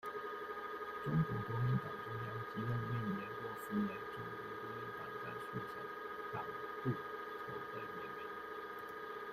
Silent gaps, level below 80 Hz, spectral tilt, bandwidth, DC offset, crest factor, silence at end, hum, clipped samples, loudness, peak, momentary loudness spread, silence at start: none; -68 dBFS; -7.5 dB/octave; 15.5 kHz; under 0.1%; 18 dB; 0 s; none; under 0.1%; -43 LUFS; -24 dBFS; 8 LU; 0 s